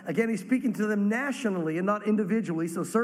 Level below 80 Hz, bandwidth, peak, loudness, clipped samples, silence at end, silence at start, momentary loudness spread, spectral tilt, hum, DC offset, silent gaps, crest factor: -78 dBFS; 14.5 kHz; -12 dBFS; -28 LUFS; under 0.1%; 0 s; 0 s; 3 LU; -6.5 dB/octave; none; under 0.1%; none; 16 dB